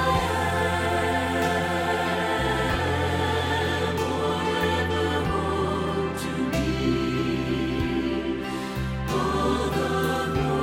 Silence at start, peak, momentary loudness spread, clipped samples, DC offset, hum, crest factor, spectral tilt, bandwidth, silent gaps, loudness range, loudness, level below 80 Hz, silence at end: 0 s; -10 dBFS; 3 LU; under 0.1%; under 0.1%; none; 14 dB; -5.5 dB/octave; 16.5 kHz; none; 2 LU; -25 LUFS; -38 dBFS; 0 s